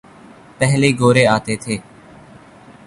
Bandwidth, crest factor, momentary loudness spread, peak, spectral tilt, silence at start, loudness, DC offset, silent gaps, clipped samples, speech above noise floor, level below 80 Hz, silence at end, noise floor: 11.5 kHz; 18 dB; 12 LU; -2 dBFS; -5.5 dB/octave; 0.6 s; -16 LUFS; under 0.1%; none; under 0.1%; 28 dB; -50 dBFS; 1.05 s; -43 dBFS